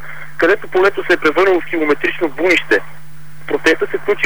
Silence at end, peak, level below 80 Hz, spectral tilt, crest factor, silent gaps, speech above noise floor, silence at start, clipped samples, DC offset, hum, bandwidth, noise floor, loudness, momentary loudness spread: 0 s; -4 dBFS; -50 dBFS; -4.5 dB/octave; 12 dB; none; 23 dB; 0 s; under 0.1%; 6%; none; over 20 kHz; -38 dBFS; -15 LUFS; 6 LU